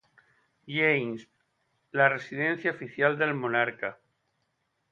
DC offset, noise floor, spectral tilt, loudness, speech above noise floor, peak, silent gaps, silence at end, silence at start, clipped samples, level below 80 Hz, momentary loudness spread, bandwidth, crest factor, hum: under 0.1%; -77 dBFS; -7 dB/octave; -27 LUFS; 49 dB; -8 dBFS; none; 0.95 s; 0.65 s; under 0.1%; -76 dBFS; 12 LU; 7.4 kHz; 22 dB; none